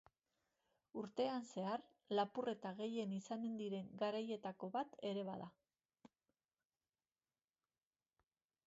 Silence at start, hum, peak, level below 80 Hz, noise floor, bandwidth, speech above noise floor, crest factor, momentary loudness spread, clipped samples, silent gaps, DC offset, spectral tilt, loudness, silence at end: 0.95 s; none; -28 dBFS; under -90 dBFS; under -90 dBFS; 7.6 kHz; over 46 dB; 20 dB; 7 LU; under 0.1%; none; under 0.1%; -5 dB/octave; -45 LUFS; 2.6 s